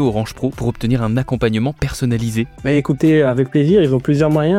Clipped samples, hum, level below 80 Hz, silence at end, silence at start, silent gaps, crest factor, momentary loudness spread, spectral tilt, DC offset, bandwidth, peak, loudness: under 0.1%; none; -36 dBFS; 0 s; 0 s; none; 12 dB; 8 LU; -7.5 dB/octave; under 0.1%; 15.5 kHz; -2 dBFS; -16 LUFS